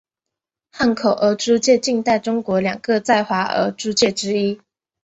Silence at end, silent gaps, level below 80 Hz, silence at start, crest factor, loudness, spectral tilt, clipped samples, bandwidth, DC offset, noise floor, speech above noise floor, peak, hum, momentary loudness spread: 0.45 s; none; -56 dBFS; 0.75 s; 16 dB; -18 LUFS; -4 dB/octave; under 0.1%; 8.2 kHz; under 0.1%; -84 dBFS; 66 dB; -2 dBFS; none; 5 LU